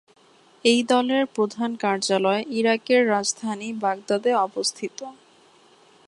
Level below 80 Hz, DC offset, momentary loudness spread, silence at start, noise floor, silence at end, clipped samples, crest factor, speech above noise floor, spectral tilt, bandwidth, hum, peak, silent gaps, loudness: -72 dBFS; under 0.1%; 10 LU; 0.65 s; -55 dBFS; 0.95 s; under 0.1%; 18 dB; 33 dB; -3 dB/octave; 11.5 kHz; none; -6 dBFS; none; -22 LUFS